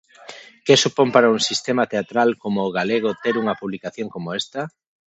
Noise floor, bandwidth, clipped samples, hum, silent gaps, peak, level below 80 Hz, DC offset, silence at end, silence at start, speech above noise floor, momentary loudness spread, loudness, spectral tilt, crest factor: -42 dBFS; 8.4 kHz; under 0.1%; none; none; 0 dBFS; -66 dBFS; under 0.1%; 0.4 s; 0.3 s; 22 dB; 15 LU; -20 LUFS; -4 dB/octave; 20 dB